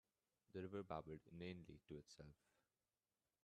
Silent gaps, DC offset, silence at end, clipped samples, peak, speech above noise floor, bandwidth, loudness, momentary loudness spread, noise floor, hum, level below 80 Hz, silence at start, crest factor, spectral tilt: none; under 0.1%; 1.1 s; under 0.1%; -34 dBFS; over 35 dB; 10 kHz; -56 LUFS; 12 LU; under -90 dBFS; none; -78 dBFS; 0.5 s; 24 dB; -6.5 dB/octave